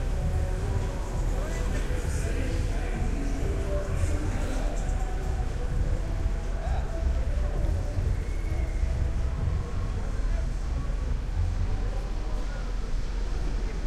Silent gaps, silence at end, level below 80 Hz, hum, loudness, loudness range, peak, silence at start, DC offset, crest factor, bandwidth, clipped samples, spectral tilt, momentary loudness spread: none; 0 s; -28 dBFS; none; -31 LUFS; 2 LU; -14 dBFS; 0 s; under 0.1%; 12 dB; 11.5 kHz; under 0.1%; -6.5 dB/octave; 4 LU